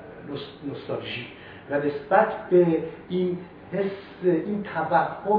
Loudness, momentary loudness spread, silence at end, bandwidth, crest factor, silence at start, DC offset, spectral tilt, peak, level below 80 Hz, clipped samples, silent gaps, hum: -26 LUFS; 15 LU; 0 s; 5 kHz; 20 dB; 0 s; under 0.1%; -10 dB/octave; -6 dBFS; -62 dBFS; under 0.1%; none; none